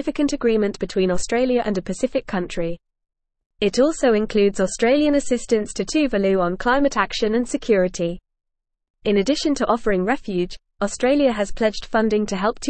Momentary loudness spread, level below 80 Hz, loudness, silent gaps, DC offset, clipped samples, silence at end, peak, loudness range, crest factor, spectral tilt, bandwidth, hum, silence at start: 8 LU; -42 dBFS; -21 LUFS; 3.46-3.50 s, 8.90-8.94 s; 0.3%; under 0.1%; 0 s; -4 dBFS; 3 LU; 16 dB; -5 dB/octave; 8.8 kHz; none; 0 s